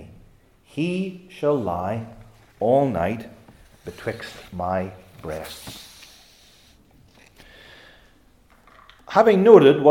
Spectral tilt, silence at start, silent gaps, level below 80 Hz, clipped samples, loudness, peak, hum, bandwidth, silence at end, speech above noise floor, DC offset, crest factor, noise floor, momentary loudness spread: -7 dB/octave; 0 s; none; -56 dBFS; under 0.1%; -20 LUFS; 0 dBFS; none; 17 kHz; 0 s; 36 dB; under 0.1%; 22 dB; -55 dBFS; 27 LU